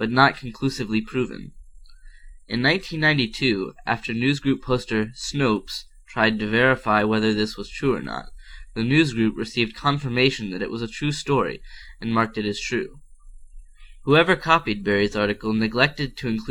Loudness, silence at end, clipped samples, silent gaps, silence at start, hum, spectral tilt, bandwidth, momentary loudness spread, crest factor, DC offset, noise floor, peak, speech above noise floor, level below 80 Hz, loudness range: -22 LUFS; 0 s; under 0.1%; none; 0 s; none; -5.5 dB/octave; 13.5 kHz; 10 LU; 20 dB; under 0.1%; -43 dBFS; -2 dBFS; 21 dB; -44 dBFS; 3 LU